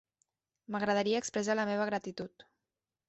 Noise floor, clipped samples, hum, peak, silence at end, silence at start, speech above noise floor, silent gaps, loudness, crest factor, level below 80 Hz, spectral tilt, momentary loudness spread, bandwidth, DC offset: under -90 dBFS; under 0.1%; none; -18 dBFS; 0.65 s; 0.7 s; over 57 dB; none; -33 LUFS; 16 dB; -74 dBFS; -3.5 dB/octave; 13 LU; 8 kHz; under 0.1%